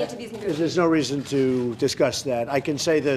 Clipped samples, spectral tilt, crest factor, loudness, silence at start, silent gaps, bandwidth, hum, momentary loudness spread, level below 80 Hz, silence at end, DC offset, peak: under 0.1%; -5 dB/octave; 16 dB; -23 LUFS; 0 s; none; 14.5 kHz; none; 6 LU; -60 dBFS; 0 s; under 0.1%; -6 dBFS